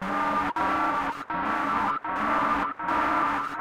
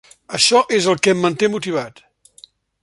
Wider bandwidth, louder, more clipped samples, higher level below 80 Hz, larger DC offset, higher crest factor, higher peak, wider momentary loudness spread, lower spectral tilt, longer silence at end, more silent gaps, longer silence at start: first, 16 kHz vs 11.5 kHz; second, -26 LUFS vs -16 LUFS; neither; first, -52 dBFS vs -62 dBFS; neither; second, 12 dB vs 18 dB; second, -14 dBFS vs 0 dBFS; second, 4 LU vs 12 LU; first, -5 dB/octave vs -3 dB/octave; second, 0 s vs 0.95 s; neither; second, 0 s vs 0.3 s